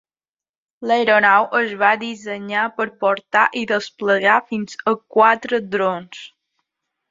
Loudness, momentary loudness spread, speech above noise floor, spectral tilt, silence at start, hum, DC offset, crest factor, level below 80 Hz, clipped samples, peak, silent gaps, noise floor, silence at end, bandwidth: -18 LUFS; 13 LU; over 72 dB; -4.5 dB/octave; 0.8 s; none; under 0.1%; 18 dB; -68 dBFS; under 0.1%; 0 dBFS; none; under -90 dBFS; 0.85 s; 7.8 kHz